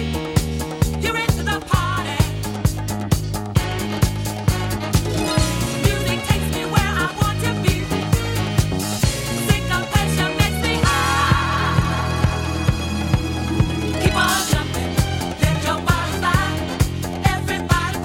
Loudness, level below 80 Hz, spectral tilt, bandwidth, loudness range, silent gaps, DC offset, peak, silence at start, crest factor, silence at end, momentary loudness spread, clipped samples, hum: -20 LUFS; -28 dBFS; -5 dB/octave; 17 kHz; 3 LU; none; under 0.1%; 0 dBFS; 0 s; 18 dB; 0 s; 5 LU; under 0.1%; none